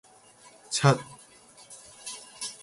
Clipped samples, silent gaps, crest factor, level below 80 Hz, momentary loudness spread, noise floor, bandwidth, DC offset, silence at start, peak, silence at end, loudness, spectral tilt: under 0.1%; none; 24 dB; -68 dBFS; 24 LU; -55 dBFS; 11.5 kHz; under 0.1%; 0.7 s; -8 dBFS; 0.05 s; -28 LUFS; -4.5 dB/octave